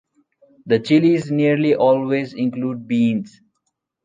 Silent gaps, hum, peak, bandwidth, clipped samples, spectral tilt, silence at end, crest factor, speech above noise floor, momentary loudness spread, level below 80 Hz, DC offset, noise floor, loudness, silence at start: none; none; -4 dBFS; 9.2 kHz; under 0.1%; -7.5 dB/octave; 0.75 s; 16 dB; 57 dB; 9 LU; -66 dBFS; under 0.1%; -74 dBFS; -18 LUFS; 0.65 s